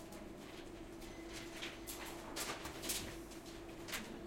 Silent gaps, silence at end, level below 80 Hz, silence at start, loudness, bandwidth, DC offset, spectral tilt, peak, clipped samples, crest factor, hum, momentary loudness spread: none; 0 s; -60 dBFS; 0 s; -47 LUFS; 16.5 kHz; under 0.1%; -2.5 dB/octave; -28 dBFS; under 0.1%; 20 dB; none; 10 LU